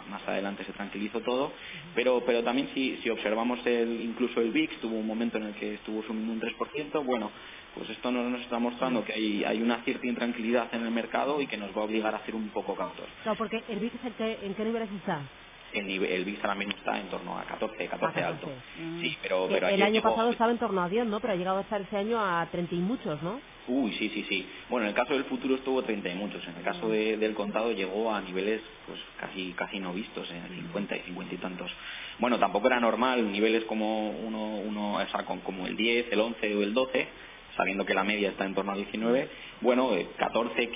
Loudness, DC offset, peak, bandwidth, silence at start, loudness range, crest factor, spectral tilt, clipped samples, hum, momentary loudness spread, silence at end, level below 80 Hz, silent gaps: -30 LUFS; under 0.1%; -10 dBFS; 3.9 kHz; 0 s; 5 LU; 20 dB; -3 dB/octave; under 0.1%; none; 10 LU; 0 s; -62 dBFS; none